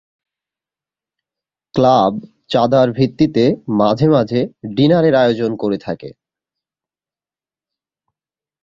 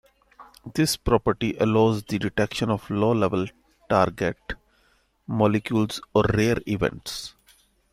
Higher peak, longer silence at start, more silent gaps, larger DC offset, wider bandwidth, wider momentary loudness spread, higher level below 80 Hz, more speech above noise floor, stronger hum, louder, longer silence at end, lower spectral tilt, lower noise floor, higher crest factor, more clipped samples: about the same, -2 dBFS vs -4 dBFS; first, 1.75 s vs 0.4 s; neither; neither; second, 7.4 kHz vs 15.5 kHz; second, 10 LU vs 13 LU; second, -52 dBFS vs -46 dBFS; first, over 76 dB vs 41 dB; neither; first, -15 LUFS vs -24 LUFS; first, 2.5 s vs 0.6 s; first, -8 dB/octave vs -6 dB/octave; first, under -90 dBFS vs -64 dBFS; about the same, 16 dB vs 20 dB; neither